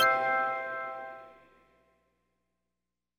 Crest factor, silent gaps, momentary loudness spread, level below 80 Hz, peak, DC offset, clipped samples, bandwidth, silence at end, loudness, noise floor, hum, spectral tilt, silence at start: 20 dB; none; 19 LU; -78 dBFS; -14 dBFS; under 0.1%; under 0.1%; 18 kHz; 1.85 s; -31 LUFS; -88 dBFS; 60 Hz at -75 dBFS; -2 dB/octave; 0 s